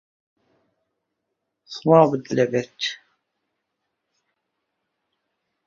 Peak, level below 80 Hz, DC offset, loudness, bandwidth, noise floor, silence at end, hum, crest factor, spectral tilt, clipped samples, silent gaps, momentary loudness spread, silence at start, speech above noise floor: -2 dBFS; -68 dBFS; under 0.1%; -20 LUFS; 7.4 kHz; -79 dBFS; 2.7 s; none; 24 dB; -6 dB/octave; under 0.1%; none; 17 LU; 1.7 s; 60 dB